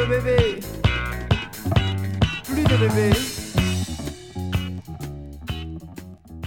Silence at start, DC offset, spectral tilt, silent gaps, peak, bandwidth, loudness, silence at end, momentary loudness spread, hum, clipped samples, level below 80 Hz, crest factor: 0 s; under 0.1%; -5.5 dB/octave; none; -4 dBFS; 18 kHz; -23 LUFS; 0 s; 16 LU; none; under 0.1%; -34 dBFS; 18 dB